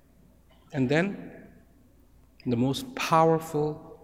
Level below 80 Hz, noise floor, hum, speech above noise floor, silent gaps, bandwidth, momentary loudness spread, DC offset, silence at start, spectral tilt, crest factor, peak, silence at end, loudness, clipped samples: -58 dBFS; -59 dBFS; none; 33 dB; none; 16 kHz; 15 LU; under 0.1%; 0.7 s; -6 dB/octave; 20 dB; -8 dBFS; 0.1 s; -27 LUFS; under 0.1%